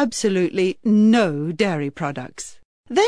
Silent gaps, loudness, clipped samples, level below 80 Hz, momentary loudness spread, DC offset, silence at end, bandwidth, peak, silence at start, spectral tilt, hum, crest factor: 2.65-2.84 s; -20 LUFS; under 0.1%; -60 dBFS; 17 LU; 0.3%; 0 s; 11 kHz; -6 dBFS; 0 s; -5.5 dB/octave; none; 14 dB